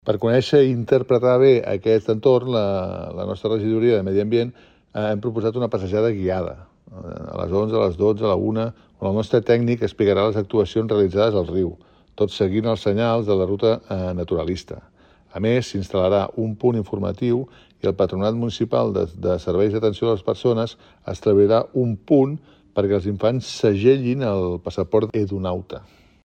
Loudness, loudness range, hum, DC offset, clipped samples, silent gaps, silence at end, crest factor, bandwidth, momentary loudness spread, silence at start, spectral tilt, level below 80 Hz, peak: -21 LUFS; 4 LU; none; under 0.1%; under 0.1%; none; 0.45 s; 16 dB; 8.8 kHz; 11 LU; 0.05 s; -7.5 dB/octave; -50 dBFS; -4 dBFS